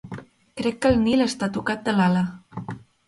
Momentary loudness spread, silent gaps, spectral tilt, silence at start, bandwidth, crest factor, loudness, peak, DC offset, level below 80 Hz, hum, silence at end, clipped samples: 19 LU; none; -6 dB/octave; 0.05 s; 11.5 kHz; 18 dB; -22 LUFS; -6 dBFS; under 0.1%; -48 dBFS; none; 0.3 s; under 0.1%